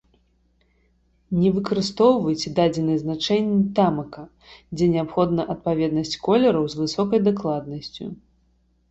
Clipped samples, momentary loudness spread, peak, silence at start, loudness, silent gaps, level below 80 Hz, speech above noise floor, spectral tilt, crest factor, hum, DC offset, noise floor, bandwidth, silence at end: under 0.1%; 15 LU; -4 dBFS; 1.3 s; -22 LUFS; none; -52 dBFS; 42 dB; -6.5 dB/octave; 18 dB; none; under 0.1%; -63 dBFS; 8.2 kHz; 0.75 s